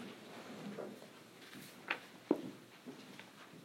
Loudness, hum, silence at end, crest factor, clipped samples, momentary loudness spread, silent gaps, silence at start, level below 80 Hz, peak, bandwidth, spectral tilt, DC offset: -46 LUFS; none; 0 s; 30 dB; under 0.1%; 15 LU; none; 0 s; under -90 dBFS; -16 dBFS; 16 kHz; -4.5 dB/octave; under 0.1%